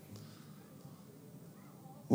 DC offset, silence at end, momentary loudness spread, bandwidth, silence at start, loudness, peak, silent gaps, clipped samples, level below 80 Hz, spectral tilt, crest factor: under 0.1%; 0 s; 3 LU; 17 kHz; 0 s; -55 LUFS; -16 dBFS; none; under 0.1%; -84 dBFS; -7 dB/octave; 26 dB